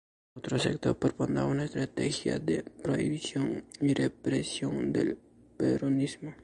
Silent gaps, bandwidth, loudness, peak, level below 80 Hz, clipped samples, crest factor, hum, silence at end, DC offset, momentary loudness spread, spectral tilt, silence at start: none; 11.5 kHz; -31 LUFS; -14 dBFS; -58 dBFS; under 0.1%; 18 dB; none; 0 s; under 0.1%; 5 LU; -6 dB/octave; 0.35 s